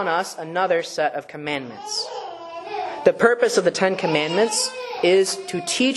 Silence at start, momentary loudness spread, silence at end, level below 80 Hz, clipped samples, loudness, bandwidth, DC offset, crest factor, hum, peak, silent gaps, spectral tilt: 0 s; 12 LU; 0 s; -70 dBFS; under 0.1%; -21 LUFS; 12.5 kHz; under 0.1%; 20 dB; none; -2 dBFS; none; -3 dB/octave